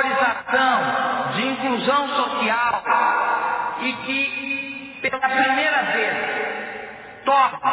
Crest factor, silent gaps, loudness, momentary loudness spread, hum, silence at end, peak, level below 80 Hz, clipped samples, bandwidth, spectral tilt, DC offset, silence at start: 16 dB; none; -21 LUFS; 8 LU; none; 0 s; -6 dBFS; -62 dBFS; under 0.1%; 4 kHz; -7 dB/octave; under 0.1%; 0 s